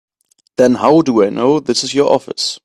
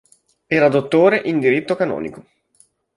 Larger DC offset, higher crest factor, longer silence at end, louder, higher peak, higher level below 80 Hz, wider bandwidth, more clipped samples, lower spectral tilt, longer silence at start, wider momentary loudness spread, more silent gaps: neither; about the same, 14 dB vs 16 dB; second, 0.05 s vs 0.75 s; first, -13 LUFS vs -17 LUFS; about the same, 0 dBFS vs -2 dBFS; about the same, -56 dBFS vs -60 dBFS; first, 13 kHz vs 11.5 kHz; neither; second, -4.5 dB/octave vs -7 dB/octave; about the same, 0.6 s vs 0.5 s; second, 5 LU vs 9 LU; neither